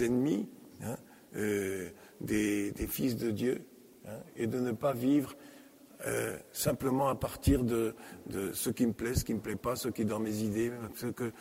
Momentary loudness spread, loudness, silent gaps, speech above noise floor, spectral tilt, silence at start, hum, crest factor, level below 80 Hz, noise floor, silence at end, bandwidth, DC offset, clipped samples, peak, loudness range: 15 LU; -33 LUFS; none; 22 dB; -5.5 dB/octave; 0 s; none; 18 dB; -50 dBFS; -55 dBFS; 0 s; 16 kHz; under 0.1%; under 0.1%; -14 dBFS; 2 LU